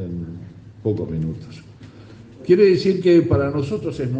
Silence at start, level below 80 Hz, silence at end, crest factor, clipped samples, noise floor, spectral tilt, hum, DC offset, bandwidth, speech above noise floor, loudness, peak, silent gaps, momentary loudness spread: 0 s; -48 dBFS; 0 s; 16 dB; under 0.1%; -42 dBFS; -8.5 dB/octave; none; under 0.1%; 8.2 kHz; 24 dB; -19 LUFS; -2 dBFS; none; 19 LU